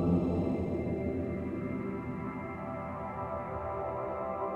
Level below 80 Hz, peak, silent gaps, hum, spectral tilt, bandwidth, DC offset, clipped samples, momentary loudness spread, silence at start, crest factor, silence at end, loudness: -54 dBFS; -16 dBFS; none; none; -10 dB/octave; 7 kHz; under 0.1%; under 0.1%; 7 LU; 0 s; 18 dB; 0 s; -35 LUFS